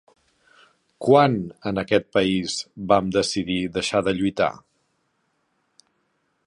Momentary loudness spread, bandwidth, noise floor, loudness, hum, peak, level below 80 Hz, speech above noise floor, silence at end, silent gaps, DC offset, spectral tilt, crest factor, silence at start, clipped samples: 11 LU; 11.5 kHz; -71 dBFS; -22 LUFS; none; -2 dBFS; -54 dBFS; 49 dB; 1.9 s; none; under 0.1%; -5 dB/octave; 22 dB; 1 s; under 0.1%